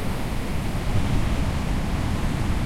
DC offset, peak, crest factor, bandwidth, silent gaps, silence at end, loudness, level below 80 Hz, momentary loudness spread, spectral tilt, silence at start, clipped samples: under 0.1%; -10 dBFS; 12 dB; 16 kHz; none; 0 s; -26 LUFS; -28 dBFS; 4 LU; -6 dB/octave; 0 s; under 0.1%